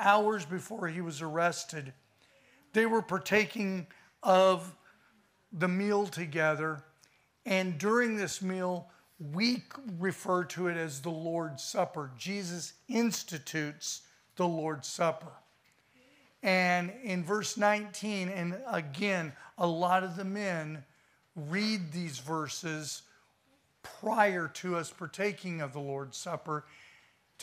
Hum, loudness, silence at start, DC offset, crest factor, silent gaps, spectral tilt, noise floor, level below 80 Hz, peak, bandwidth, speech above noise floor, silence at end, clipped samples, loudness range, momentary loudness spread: none; -32 LUFS; 0 s; under 0.1%; 22 dB; none; -4.5 dB/octave; -70 dBFS; -80 dBFS; -10 dBFS; 15.5 kHz; 38 dB; 0 s; under 0.1%; 5 LU; 13 LU